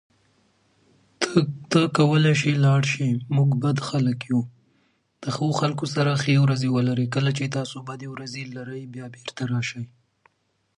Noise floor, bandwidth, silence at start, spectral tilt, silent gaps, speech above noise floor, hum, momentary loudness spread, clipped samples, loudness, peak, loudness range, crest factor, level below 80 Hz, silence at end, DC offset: -69 dBFS; 11 kHz; 1.2 s; -6 dB/octave; none; 47 dB; none; 16 LU; under 0.1%; -23 LUFS; -4 dBFS; 7 LU; 18 dB; -64 dBFS; 0.95 s; under 0.1%